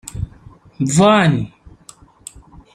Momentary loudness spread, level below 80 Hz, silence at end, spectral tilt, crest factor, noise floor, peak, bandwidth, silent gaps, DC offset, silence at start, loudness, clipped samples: 26 LU; -42 dBFS; 1.25 s; -5.5 dB/octave; 18 dB; -45 dBFS; 0 dBFS; 13 kHz; none; under 0.1%; 0.15 s; -14 LUFS; under 0.1%